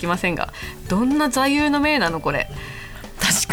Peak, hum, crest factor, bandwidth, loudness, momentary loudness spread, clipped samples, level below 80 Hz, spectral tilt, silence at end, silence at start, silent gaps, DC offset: -2 dBFS; none; 18 dB; 20 kHz; -20 LUFS; 15 LU; under 0.1%; -38 dBFS; -3.5 dB/octave; 0 s; 0 s; none; under 0.1%